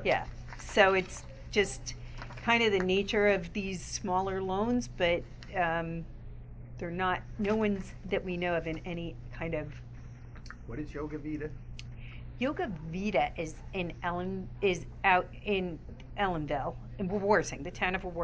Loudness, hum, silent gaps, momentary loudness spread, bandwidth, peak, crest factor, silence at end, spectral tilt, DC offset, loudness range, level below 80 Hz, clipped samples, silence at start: -32 LUFS; none; none; 18 LU; 8 kHz; -10 dBFS; 22 dB; 0 s; -5 dB/octave; under 0.1%; 9 LU; -48 dBFS; under 0.1%; 0 s